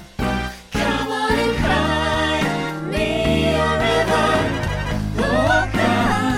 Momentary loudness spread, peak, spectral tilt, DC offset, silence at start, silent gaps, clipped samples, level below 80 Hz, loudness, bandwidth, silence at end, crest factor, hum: 6 LU; -4 dBFS; -5 dB/octave; under 0.1%; 0 s; none; under 0.1%; -32 dBFS; -19 LUFS; 17 kHz; 0 s; 14 dB; none